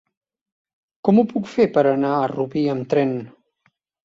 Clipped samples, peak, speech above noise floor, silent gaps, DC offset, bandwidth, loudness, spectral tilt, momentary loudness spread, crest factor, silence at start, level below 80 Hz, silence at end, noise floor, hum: under 0.1%; -2 dBFS; 48 dB; none; under 0.1%; 7.6 kHz; -20 LUFS; -8.5 dB/octave; 7 LU; 18 dB; 1.05 s; -62 dBFS; 0.75 s; -67 dBFS; none